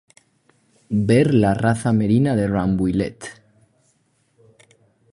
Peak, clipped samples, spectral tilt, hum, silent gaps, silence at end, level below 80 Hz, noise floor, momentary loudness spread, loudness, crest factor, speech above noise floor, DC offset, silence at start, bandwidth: -2 dBFS; under 0.1%; -7.5 dB/octave; none; none; 1.8 s; -46 dBFS; -64 dBFS; 11 LU; -19 LUFS; 18 dB; 46 dB; under 0.1%; 0.9 s; 11 kHz